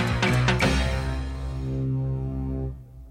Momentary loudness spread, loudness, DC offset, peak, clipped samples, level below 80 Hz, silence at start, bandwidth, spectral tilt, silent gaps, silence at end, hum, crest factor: 11 LU; -26 LUFS; under 0.1%; -10 dBFS; under 0.1%; -32 dBFS; 0 s; 15 kHz; -5.5 dB/octave; none; 0 s; none; 16 dB